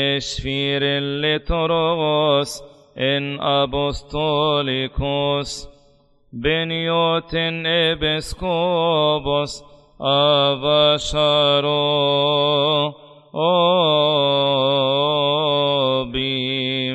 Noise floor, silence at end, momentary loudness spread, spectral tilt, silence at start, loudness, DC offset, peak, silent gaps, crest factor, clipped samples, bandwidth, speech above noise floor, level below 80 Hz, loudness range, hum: -55 dBFS; 0 s; 8 LU; -5 dB/octave; 0 s; -18 LUFS; under 0.1%; -4 dBFS; none; 14 dB; under 0.1%; 12 kHz; 36 dB; -40 dBFS; 4 LU; none